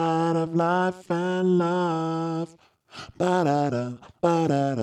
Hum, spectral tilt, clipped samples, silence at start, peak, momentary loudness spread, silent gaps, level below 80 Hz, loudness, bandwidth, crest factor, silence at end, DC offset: none; -7 dB/octave; under 0.1%; 0 s; -8 dBFS; 10 LU; none; -66 dBFS; -24 LUFS; 10.5 kHz; 16 dB; 0 s; under 0.1%